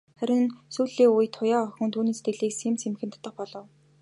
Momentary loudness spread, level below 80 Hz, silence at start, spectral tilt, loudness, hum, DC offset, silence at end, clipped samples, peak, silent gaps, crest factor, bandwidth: 17 LU; -80 dBFS; 0.2 s; -5 dB/octave; -26 LUFS; none; under 0.1%; 0.4 s; under 0.1%; -10 dBFS; none; 16 dB; 11.5 kHz